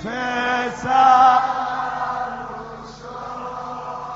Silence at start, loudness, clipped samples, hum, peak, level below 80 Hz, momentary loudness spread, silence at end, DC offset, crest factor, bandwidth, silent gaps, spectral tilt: 0 s; -18 LUFS; under 0.1%; 50 Hz at -50 dBFS; -2 dBFS; -52 dBFS; 20 LU; 0 s; under 0.1%; 18 dB; 7.8 kHz; none; -1.5 dB/octave